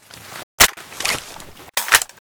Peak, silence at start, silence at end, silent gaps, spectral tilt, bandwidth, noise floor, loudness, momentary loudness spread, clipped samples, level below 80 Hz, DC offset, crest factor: 0 dBFS; 0.15 s; 0.2 s; 0.43-0.58 s; 0.5 dB/octave; over 20 kHz; -39 dBFS; -17 LUFS; 22 LU; under 0.1%; -42 dBFS; under 0.1%; 22 dB